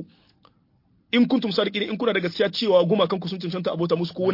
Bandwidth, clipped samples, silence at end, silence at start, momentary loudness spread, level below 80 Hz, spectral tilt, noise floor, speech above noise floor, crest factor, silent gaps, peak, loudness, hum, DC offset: 5.8 kHz; under 0.1%; 0 s; 0 s; 8 LU; -66 dBFS; -7 dB/octave; -63 dBFS; 41 dB; 18 dB; none; -6 dBFS; -23 LUFS; none; under 0.1%